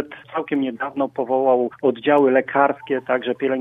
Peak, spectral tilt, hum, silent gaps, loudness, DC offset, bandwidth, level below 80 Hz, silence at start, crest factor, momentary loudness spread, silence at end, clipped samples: 0 dBFS; -8 dB/octave; none; none; -20 LUFS; under 0.1%; 3.9 kHz; -70 dBFS; 0 s; 20 dB; 8 LU; 0 s; under 0.1%